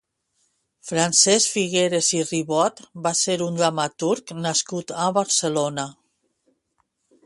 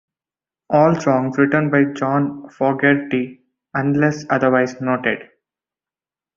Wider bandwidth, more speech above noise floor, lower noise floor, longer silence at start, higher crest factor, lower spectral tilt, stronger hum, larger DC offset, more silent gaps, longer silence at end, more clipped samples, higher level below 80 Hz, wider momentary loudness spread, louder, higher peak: first, 11.5 kHz vs 7.4 kHz; second, 50 dB vs over 73 dB; second, -71 dBFS vs under -90 dBFS; first, 0.85 s vs 0.7 s; about the same, 20 dB vs 18 dB; second, -2.5 dB/octave vs -7.5 dB/octave; neither; neither; neither; first, 1.35 s vs 1.1 s; neither; second, -68 dBFS vs -60 dBFS; first, 11 LU vs 8 LU; second, -21 LUFS vs -18 LUFS; about the same, -4 dBFS vs -2 dBFS